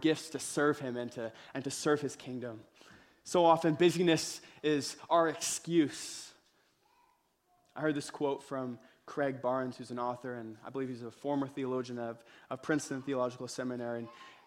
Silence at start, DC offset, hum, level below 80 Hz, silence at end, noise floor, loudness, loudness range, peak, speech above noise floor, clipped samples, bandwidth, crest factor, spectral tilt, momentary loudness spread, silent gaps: 0 s; under 0.1%; none; -76 dBFS; 0.15 s; -73 dBFS; -34 LUFS; 8 LU; -12 dBFS; 39 dB; under 0.1%; 16 kHz; 22 dB; -4.5 dB/octave; 15 LU; none